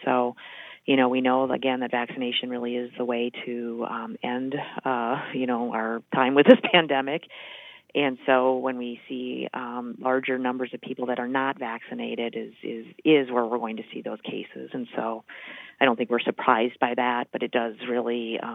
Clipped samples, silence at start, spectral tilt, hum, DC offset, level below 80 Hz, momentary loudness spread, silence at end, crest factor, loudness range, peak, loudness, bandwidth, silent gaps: under 0.1%; 0 s; -7.5 dB/octave; none; under 0.1%; -82 dBFS; 14 LU; 0 s; 26 dB; 7 LU; 0 dBFS; -25 LUFS; 4 kHz; none